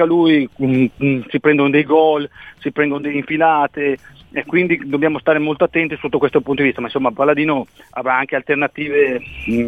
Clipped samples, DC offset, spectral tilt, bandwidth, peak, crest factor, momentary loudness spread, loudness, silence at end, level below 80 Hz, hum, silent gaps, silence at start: under 0.1%; 0.1%; -8 dB/octave; 4.9 kHz; -2 dBFS; 16 dB; 9 LU; -17 LUFS; 0 s; -50 dBFS; none; none; 0 s